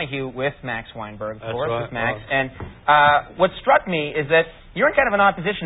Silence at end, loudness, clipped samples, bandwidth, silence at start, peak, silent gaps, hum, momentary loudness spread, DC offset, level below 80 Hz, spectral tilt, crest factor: 0 s; -20 LUFS; under 0.1%; 4 kHz; 0 s; -4 dBFS; none; none; 13 LU; under 0.1%; -46 dBFS; -10 dB/octave; 18 dB